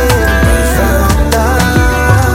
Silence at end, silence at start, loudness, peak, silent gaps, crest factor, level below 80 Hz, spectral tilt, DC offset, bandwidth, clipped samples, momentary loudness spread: 0 s; 0 s; -10 LUFS; 0 dBFS; none; 8 dB; -14 dBFS; -5 dB/octave; under 0.1%; 17 kHz; under 0.1%; 1 LU